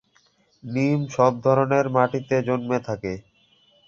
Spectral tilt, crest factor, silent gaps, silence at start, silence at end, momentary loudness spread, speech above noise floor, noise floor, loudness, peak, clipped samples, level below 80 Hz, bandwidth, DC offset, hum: -7.5 dB/octave; 20 dB; none; 0.65 s; 0.7 s; 11 LU; 41 dB; -62 dBFS; -22 LUFS; -4 dBFS; under 0.1%; -58 dBFS; 7.4 kHz; under 0.1%; none